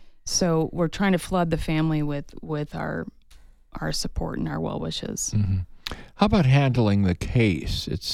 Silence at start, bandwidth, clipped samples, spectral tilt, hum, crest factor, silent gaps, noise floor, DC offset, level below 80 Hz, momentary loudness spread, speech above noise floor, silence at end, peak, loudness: 0 s; 14.5 kHz; under 0.1%; -5.5 dB/octave; none; 18 dB; none; -50 dBFS; under 0.1%; -38 dBFS; 13 LU; 26 dB; 0 s; -6 dBFS; -25 LUFS